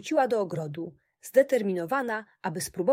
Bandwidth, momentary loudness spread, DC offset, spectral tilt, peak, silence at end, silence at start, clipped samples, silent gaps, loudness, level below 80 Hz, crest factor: 16 kHz; 14 LU; under 0.1%; -5 dB/octave; -8 dBFS; 0 s; 0 s; under 0.1%; none; -28 LUFS; -68 dBFS; 18 dB